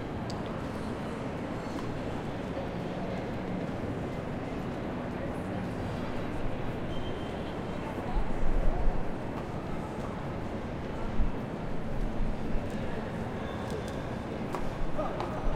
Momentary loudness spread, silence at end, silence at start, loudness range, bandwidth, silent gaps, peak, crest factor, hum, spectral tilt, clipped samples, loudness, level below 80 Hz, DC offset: 2 LU; 0 s; 0 s; 1 LU; 10.5 kHz; none; -14 dBFS; 18 dB; none; -7 dB/octave; under 0.1%; -36 LUFS; -36 dBFS; under 0.1%